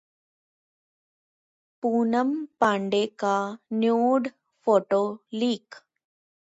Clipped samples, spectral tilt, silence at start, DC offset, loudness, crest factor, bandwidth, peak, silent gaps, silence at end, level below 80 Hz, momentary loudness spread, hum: under 0.1%; -5.5 dB/octave; 1.85 s; under 0.1%; -25 LUFS; 18 dB; 8 kHz; -8 dBFS; none; 0.7 s; -78 dBFS; 8 LU; none